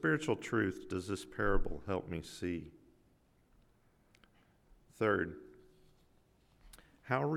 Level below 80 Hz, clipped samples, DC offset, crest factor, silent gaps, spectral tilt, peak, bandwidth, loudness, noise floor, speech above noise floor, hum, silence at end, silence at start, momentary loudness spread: -48 dBFS; under 0.1%; under 0.1%; 20 dB; none; -6 dB/octave; -18 dBFS; 13.5 kHz; -37 LUFS; -70 dBFS; 35 dB; none; 0 s; 0 s; 11 LU